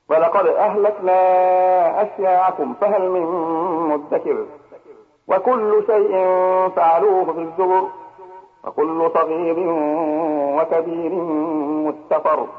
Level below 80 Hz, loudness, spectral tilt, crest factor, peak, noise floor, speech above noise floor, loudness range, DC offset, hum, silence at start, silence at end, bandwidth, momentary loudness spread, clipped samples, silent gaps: -70 dBFS; -18 LUFS; -9 dB/octave; 12 dB; -6 dBFS; -47 dBFS; 29 dB; 4 LU; under 0.1%; none; 0.1 s; 0 s; 4.9 kHz; 8 LU; under 0.1%; none